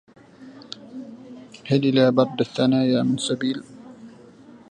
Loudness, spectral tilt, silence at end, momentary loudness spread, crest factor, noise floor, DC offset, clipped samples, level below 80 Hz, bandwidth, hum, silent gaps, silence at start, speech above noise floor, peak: -21 LUFS; -6 dB/octave; 0.6 s; 24 LU; 20 dB; -47 dBFS; under 0.1%; under 0.1%; -66 dBFS; 10 kHz; none; none; 0.4 s; 27 dB; -4 dBFS